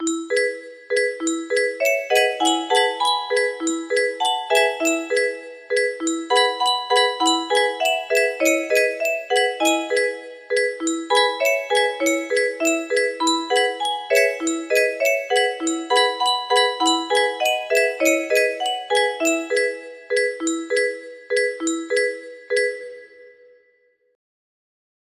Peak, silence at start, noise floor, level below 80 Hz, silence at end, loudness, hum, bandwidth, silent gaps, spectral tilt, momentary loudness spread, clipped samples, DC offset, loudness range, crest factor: -4 dBFS; 0 s; -62 dBFS; -70 dBFS; 1.9 s; -20 LUFS; none; 15 kHz; none; 0.5 dB/octave; 7 LU; under 0.1%; under 0.1%; 4 LU; 18 dB